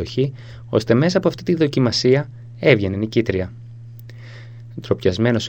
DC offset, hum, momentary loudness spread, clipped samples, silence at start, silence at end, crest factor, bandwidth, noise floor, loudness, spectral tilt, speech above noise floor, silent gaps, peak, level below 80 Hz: 0.2%; none; 22 LU; under 0.1%; 0 s; 0 s; 20 dB; 16.5 kHz; -37 dBFS; -19 LUFS; -6.5 dB/octave; 19 dB; none; 0 dBFS; -50 dBFS